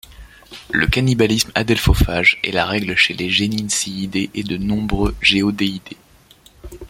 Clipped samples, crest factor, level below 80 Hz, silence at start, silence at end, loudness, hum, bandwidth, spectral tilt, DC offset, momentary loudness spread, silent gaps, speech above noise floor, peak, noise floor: under 0.1%; 18 dB; -30 dBFS; 0.1 s; 0 s; -17 LUFS; none; 16.5 kHz; -4 dB/octave; under 0.1%; 8 LU; none; 31 dB; 0 dBFS; -49 dBFS